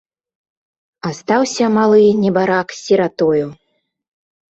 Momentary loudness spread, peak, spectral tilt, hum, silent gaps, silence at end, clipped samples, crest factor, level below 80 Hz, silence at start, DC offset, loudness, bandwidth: 14 LU; -2 dBFS; -5.5 dB/octave; none; none; 1 s; under 0.1%; 14 dB; -58 dBFS; 1.05 s; under 0.1%; -15 LUFS; 8.2 kHz